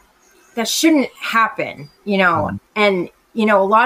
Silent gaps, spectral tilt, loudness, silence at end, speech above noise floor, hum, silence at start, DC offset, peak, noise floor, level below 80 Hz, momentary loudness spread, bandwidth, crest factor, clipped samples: none; -4 dB/octave; -17 LUFS; 0 s; 36 dB; none; 0.55 s; under 0.1%; -2 dBFS; -52 dBFS; -56 dBFS; 12 LU; 15.5 kHz; 16 dB; under 0.1%